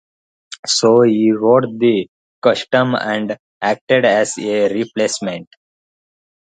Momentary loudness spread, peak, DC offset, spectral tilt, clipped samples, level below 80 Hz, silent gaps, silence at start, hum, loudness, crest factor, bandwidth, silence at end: 13 LU; 0 dBFS; under 0.1%; -4.5 dB/octave; under 0.1%; -64 dBFS; 0.59-0.63 s, 2.08-2.42 s, 3.39-3.61 s, 3.81-3.87 s; 0.5 s; none; -16 LUFS; 16 dB; 9.4 kHz; 1.1 s